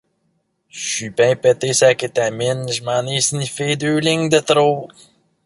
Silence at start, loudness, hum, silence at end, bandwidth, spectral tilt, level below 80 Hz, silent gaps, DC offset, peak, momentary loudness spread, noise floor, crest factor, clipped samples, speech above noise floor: 0.75 s; -17 LUFS; none; 0.6 s; 11.5 kHz; -3.5 dB/octave; -58 dBFS; none; under 0.1%; -2 dBFS; 9 LU; -67 dBFS; 16 dB; under 0.1%; 50 dB